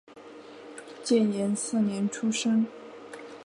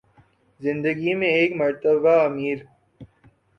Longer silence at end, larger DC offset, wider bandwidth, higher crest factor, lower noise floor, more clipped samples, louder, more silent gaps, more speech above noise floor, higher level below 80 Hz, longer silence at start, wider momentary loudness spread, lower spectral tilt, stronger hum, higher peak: second, 0 s vs 0.55 s; neither; first, 11.5 kHz vs 6.2 kHz; about the same, 16 dB vs 16 dB; second, -47 dBFS vs -58 dBFS; neither; second, -27 LUFS vs -21 LUFS; neither; second, 21 dB vs 38 dB; second, -78 dBFS vs -64 dBFS; second, 0.1 s vs 0.6 s; first, 21 LU vs 11 LU; second, -5 dB/octave vs -7.5 dB/octave; neither; second, -12 dBFS vs -6 dBFS